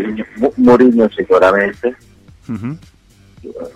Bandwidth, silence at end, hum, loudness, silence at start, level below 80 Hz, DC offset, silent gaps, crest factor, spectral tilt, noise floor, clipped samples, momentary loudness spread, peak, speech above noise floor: 8.4 kHz; 0.05 s; none; -12 LUFS; 0 s; -46 dBFS; under 0.1%; none; 14 dB; -7.5 dB/octave; -45 dBFS; under 0.1%; 20 LU; 0 dBFS; 32 dB